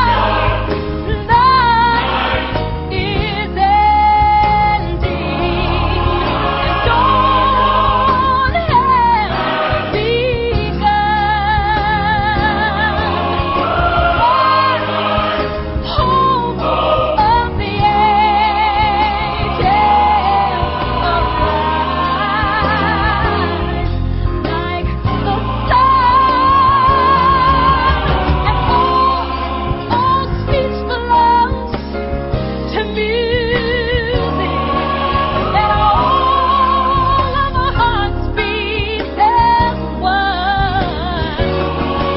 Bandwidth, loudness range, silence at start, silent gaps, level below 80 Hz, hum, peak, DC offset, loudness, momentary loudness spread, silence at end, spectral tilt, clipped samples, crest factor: 5.8 kHz; 4 LU; 0 s; none; -24 dBFS; none; 0 dBFS; under 0.1%; -14 LUFS; 8 LU; 0 s; -11 dB/octave; under 0.1%; 14 dB